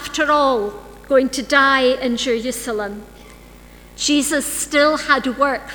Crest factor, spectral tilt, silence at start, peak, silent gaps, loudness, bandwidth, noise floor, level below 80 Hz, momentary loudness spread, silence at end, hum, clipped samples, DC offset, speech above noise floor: 18 dB; -2 dB/octave; 0 s; 0 dBFS; none; -17 LUFS; over 20 kHz; -42 dBFS; -46 dBFS; 11 LU; 0 s; 60 Hz at -50 dBFS; under 0.1%; under 0.1%; 24 dB